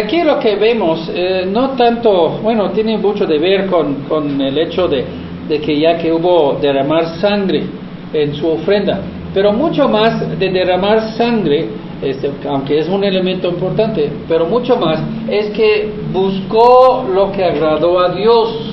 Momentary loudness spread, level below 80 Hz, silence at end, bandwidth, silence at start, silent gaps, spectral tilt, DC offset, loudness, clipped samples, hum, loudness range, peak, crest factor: 7 LU; -42 dBFS; 0 s; 6 kHz; 0 s; none; -8.5 dB/octave; under 0.1%; -14 LUFS; under 0.1%; none; 3 LU; 0 dBFS; 14 dB